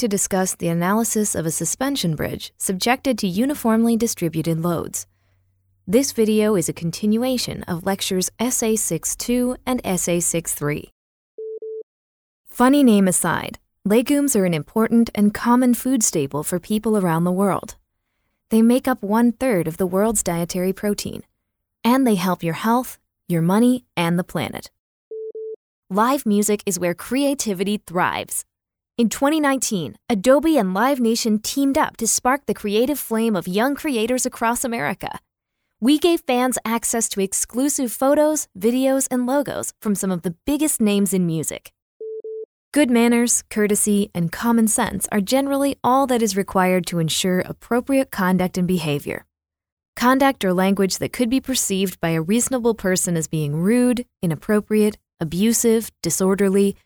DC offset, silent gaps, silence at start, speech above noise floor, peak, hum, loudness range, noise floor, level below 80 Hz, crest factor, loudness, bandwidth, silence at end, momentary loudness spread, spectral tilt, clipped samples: under 0.1%; 10.92-11.38 s, 11.83-12.44 s, 24.79-25.11 s, 25.56-25.83 s, 41.82-42.00 s, 42.45-42.72 s, 49.72-49.77 s, 49.88-49.93 s; 0 s; 62 dB; -4 dBFS; none; 3 LU; -82 dBFS; -50 dBFS; 18 dB; -20 LUFS; over 20 kHz; 0.15 s; 9 LU; -4.5 dB/octave; under 0.1%